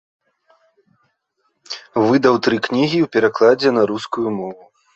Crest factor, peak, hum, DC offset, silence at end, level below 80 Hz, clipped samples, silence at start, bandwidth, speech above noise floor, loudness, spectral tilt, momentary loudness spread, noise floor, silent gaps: 16 dB; -2 dBFS; none; under 0.1%; 0.4 s; -62 dBFS; under 0.1%; 1.7 s; 8.2 kHz; 53 dB; -17 LUFS; -6 dB/octave; 13 LU; -69 dBFS; none